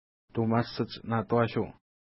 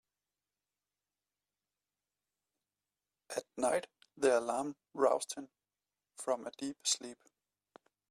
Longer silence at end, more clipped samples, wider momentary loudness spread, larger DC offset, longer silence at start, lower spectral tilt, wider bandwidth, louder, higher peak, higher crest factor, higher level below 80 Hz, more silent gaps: second, 0.4 s vs 0.95 s; neither; second, 9 LU vs 13 LU; neither; second, 0.35 s vs 3.3 s; first, -10.5 dB/octave vs -2 dB/octave; second, 5.8 kHz vs 14 kHz; first, -30 LUFS vs -36 LUFS; first, -12 dBFS vs -16 dBFS; about the same, 20 dB vs 22 dB; first, -62 dBFS vs -82 dBFS; neither